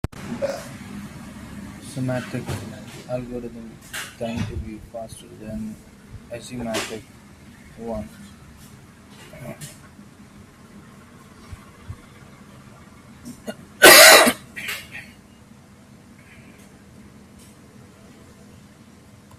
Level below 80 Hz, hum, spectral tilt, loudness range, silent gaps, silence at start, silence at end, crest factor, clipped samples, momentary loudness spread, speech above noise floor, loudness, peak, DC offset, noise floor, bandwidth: -50 dBFS; none; -1.5 dB/octave; 24 LU; none; 0.15 s; 4.35 s; 24 dB; under 0.1%; 26 LU; 17 dB; -15 LUFS; 0 dBFS; under 0.1%; -48 dBFS; 16 kHz